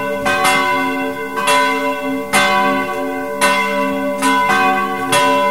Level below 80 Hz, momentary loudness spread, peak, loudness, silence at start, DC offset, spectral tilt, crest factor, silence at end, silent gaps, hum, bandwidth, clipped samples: -50 dBFS; 7 LU; 0 dBFS; -15 LUFS; 0 s; 1%; -3 dB/octave; 16 dB; 0 s; none; none; 16.5 kHz; under 0.1%